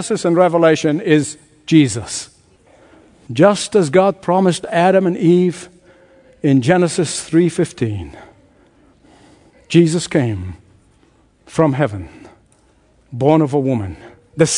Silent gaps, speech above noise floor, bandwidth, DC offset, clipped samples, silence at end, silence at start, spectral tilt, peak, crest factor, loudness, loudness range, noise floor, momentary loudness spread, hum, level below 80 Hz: none; 39 dB; 11 kHz; under 0.1%; under 0.1%; 0 s; 0 s; -6 dB/octave; 0 dBFS; 16 dB; -15 LUFS; 6 LU; -54 dBFS; 17 LU; none; -52 dBFS